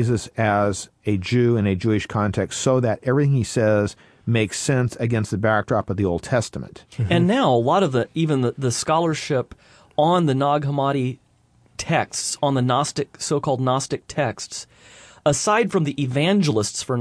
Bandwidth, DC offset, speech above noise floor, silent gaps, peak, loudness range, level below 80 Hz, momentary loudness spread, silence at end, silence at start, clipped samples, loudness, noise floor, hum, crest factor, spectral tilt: 11 kHz; under 0.1%; 37 dB; none; -6 dBFS; 2 LU; -52 dBFS; 9 LU; 0 s; 0 s; under 0.1%; -21 LUFS; -58 dBFS; none; 16 dB; -5.5 dB/octave